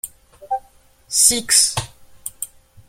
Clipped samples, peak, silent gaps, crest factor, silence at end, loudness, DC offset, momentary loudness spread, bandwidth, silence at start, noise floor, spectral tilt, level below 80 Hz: under 0.1%; 0 dBFS; none; 22 dB; 0.45 s; -16 LUFS; under 0.1%; 21 LU; 16.5 kHz; 0.05 s; -51 dBFS; 0 dB/octave; -50 dBFS